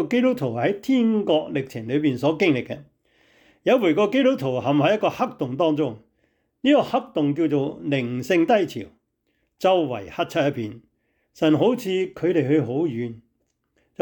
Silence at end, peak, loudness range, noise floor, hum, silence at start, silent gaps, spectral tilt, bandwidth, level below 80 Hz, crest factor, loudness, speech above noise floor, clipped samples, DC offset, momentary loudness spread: 0.8 s; -8 dBFS; 2 LU; -72 dBFS; none; 0 s; none; -7 dB/octave; 19.5 kHz; -64 dBFS; 14 dB; -22 LUFS; 50 dB; under 0.1%; under 0.1%; 9 LU